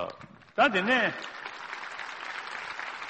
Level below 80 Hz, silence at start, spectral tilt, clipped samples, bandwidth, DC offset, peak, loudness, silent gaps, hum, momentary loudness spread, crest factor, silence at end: -70 dBFS; 0 s; -4 dB/octave; under 0.1%; 8.4 kHz; under 0.1%; -12 dBFS; -30 LUFS; none; none; 15 LU; 20 dB; 0 s